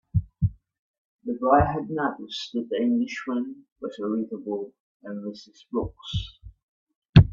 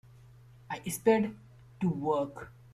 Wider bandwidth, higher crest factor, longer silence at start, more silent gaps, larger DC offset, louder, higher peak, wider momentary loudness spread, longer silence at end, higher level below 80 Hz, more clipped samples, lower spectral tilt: second, 7.4 kHz vs 15.5 kHz; about the same, 24 dB vs 20 dB; second, 0.15 s vs 0.7 s; first, 0.79-1.19 s, 3.72-3.76 s, 4.80-5.00 s, 6.63-6.87 s, 6.96-7.02 s, 7.09-7.13 s vs none; neither; first, -27 LUFS vs -31 LUFS; first, -2 dBFS vs -14 dBFS; first, 18 LU vs 14 LU; second, 0 s vs 0.2 s; first, -40 dBFS vs -64 dBFS; neither; first, -8 dB/octave vs -6 dB/octave